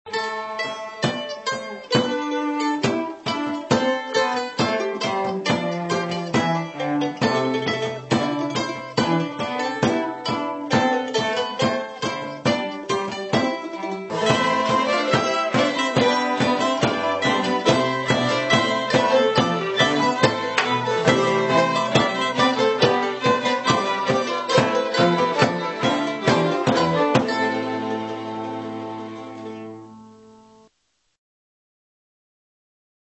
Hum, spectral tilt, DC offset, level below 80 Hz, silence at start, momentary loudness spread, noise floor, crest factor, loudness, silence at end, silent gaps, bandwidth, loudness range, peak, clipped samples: none; -4.5 dB/octave; under 0.1%; -60 dBFS; 0.05 s; 8 LU; -70 dBFS; 20 dB; -21 LUFS; 3 s; none; 8.4 kHz; 5 LU; -2 dBFS; under 0.1%